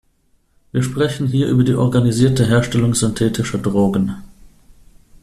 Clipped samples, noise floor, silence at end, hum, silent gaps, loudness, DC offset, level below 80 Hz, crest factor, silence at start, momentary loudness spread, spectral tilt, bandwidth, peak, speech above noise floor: under 0.1%; -59 dBFS; 0.95 s; none; none; -17 LUFS; under 0.1%; -42 dBFS; 14 dB; 0.75 s; 7 LU; -6 dB/octave; 13.5 kHz; -2 dBFS; 43 dB